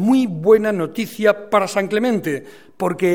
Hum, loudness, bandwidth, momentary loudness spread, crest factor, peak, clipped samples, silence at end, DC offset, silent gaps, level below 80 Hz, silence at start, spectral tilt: none; -18 LUFS; 17 kHz; 10 LU; 16 dB; -2 dBFS; under 0.1%; 0 s; 0.4%; none; -62 dBFS; 0 s; -6 dB/octave